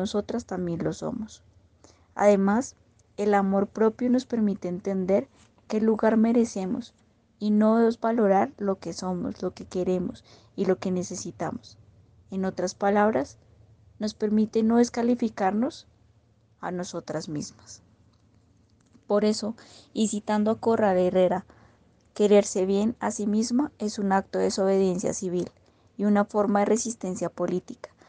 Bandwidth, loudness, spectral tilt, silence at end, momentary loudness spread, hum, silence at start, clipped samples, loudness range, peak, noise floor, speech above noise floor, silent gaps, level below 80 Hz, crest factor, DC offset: 9.8 kHz; -26 LUFS; -6 dB/octave; 0.25 s; 13 LU; none; 0 s; under 0.1%; 6 LU; -8 dBFS; -62 dBFS; 37 dB; none; -62 dBFS; 18 dB; under 0.1%